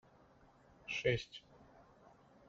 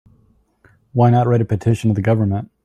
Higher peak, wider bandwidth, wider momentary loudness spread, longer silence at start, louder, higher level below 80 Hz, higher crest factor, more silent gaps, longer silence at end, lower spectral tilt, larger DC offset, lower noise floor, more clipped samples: second, -20 dBFS vs -4 dBFS; second, 7.8 kHz vs 9.4 kHz; first, 20 LU vs 6 LU; about the same, 0.85 s vs 0.95 s; second, -39 LUFS vs -17 LUFS; second, -66 dBFS vs -50 dBFS; first, 24 dB vs 14 dB; neither; first, 0.85 s vs 0.2 s; second, -3.5 dB/octave vs -9 dB/octave; neither; first, -66 dBFS vs -57 dBFS; neither